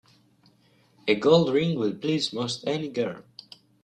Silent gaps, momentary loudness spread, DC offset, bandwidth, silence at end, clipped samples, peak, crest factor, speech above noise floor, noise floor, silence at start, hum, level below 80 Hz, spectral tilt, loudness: none; 17 LU; under 0.1%; 10.5 kHz; 0.65 s; under 0.1%; -6 dBFS; 20 dB; 37 dB; -62 dBFS; 1.05 s; none; -66 dBFS; -5.5 dB/octave; -25 LUFS